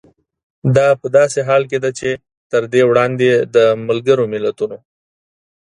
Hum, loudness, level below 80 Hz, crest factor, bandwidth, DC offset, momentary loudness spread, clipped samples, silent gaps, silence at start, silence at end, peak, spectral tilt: none; -15 LUFS; -54 dBFS; 16 dB; 11 kHz; under 0.1%; 9 LU; under 0.1%; 2.37-2.50 s; 0.65 s; 1 s; 0 dBFS; -6 dB/octave